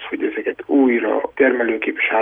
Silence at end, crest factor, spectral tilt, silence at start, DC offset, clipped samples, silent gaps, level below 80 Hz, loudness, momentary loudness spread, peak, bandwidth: 0 s; 16 dB; -7.5 dB/octave; 0 s; under 0.1%; under 0.1%; none; -60 dBFS; -18 LUFS; 7 LU; -2 dBFS; 3.7 kHz